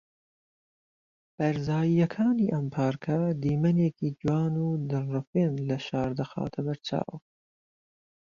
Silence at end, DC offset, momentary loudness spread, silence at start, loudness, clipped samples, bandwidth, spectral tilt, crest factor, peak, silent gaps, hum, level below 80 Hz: 1.1 s; under 0.1%; 7 LU; 1.4 s; -28 LUFS; under 0.1%; 7.2 kHz; -8.5 dB/octave; 16 dB; -12 dBFS; 5.27-5.33 s; none; -60 dBFS